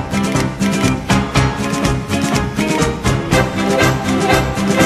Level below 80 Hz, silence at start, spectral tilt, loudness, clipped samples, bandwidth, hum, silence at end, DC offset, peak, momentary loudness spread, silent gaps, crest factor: -30 dBFS; 0 s; -5 dB/octave; -16 LUFS; under 0.1%; 15 kHz; none; 0 s; under 0.1%; 0 dBFS; 3 LU; none; 14 dB